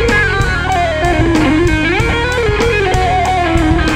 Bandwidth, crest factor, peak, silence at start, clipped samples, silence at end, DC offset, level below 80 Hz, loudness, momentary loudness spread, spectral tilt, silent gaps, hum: 15.5 kHz; 12 dB; 0 dBFS; 0 s; under 0.1%; 0 s; under 0.1%; -20 dBFS; -13 LUFS; 2 LU; -5.5 dB/octave; none; none